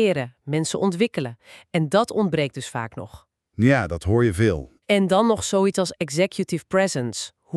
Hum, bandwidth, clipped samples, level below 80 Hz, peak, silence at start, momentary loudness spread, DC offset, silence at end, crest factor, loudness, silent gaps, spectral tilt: none; 13 kHz; under 0.1%; -48 dBFS; -4 dBFS; 0 s; 12 LU; under 0.1%; 0 s; 18 dB; -22 LUFS; none; -5.5 dB/octave